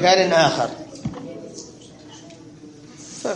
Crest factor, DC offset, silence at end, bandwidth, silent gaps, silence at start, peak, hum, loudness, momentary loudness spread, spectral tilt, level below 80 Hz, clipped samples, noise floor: 22 dB; under 0.1%; 0 s; 10.5 kHz; none; 0 s; -2 dBFS; none; -20 LUFS; 27 LU; -3.5 dB/octave; -56 dBFS; under 0.1%; -42 dBFS